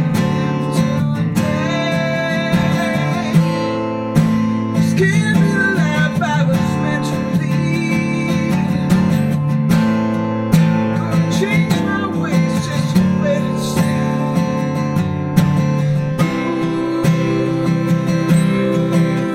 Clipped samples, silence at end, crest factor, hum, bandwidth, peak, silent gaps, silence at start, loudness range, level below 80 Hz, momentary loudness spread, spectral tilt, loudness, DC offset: under 0.1%; 0 s; 16 dB; none; 15 kHz; 0 dBFS; none; 0 s; 2 LU; -44 dBFS; 4 LU; -7 dB/octave; -16 LUFS; under 0.1%